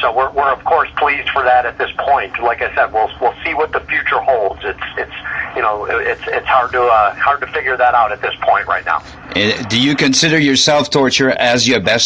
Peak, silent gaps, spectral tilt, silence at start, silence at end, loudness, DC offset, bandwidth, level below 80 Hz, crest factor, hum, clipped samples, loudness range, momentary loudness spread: 0 dBFS; none; -3 dB/octave; 0 s; 0 s; -14 LUFS; under 0.1%; 10 kHz; -42 dBFS; 14 dB; none; under 0.1%; 4 LU; 8 LU